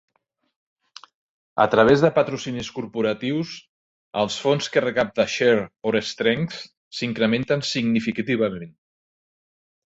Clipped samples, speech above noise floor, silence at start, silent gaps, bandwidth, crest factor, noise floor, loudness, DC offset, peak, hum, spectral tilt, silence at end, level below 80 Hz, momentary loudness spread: under 0.1%; over 69 dB; 1.55 s; 3.69-4.11 s, 6.77-6.91 s; 8 kHz; 20 dB; under -90 dBFS; -22 LUFS; under 0.1%; -2 dBFS; none; -5 dB/octave; 1.25 s; -58 dBFS; 14 LU